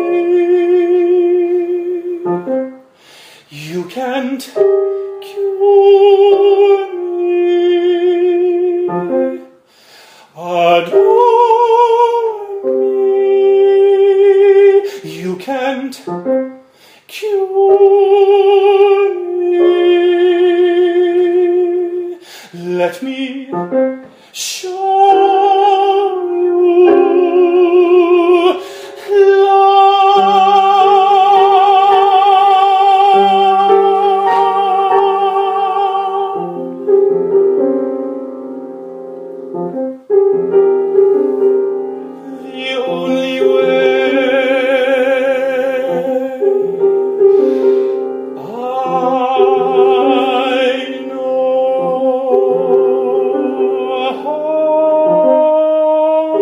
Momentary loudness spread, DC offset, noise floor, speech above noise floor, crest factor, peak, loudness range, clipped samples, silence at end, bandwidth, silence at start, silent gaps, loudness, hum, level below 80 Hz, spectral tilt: 13 LU; under 0.1%; -44 dBFS; 34 dB; 12 dB; 0 dBFS; 7 LU; under 0.1%; 0 s; 11 kHz; 0 s; none; -12 LUFS; none; -68 dBFS; -5 dB/octave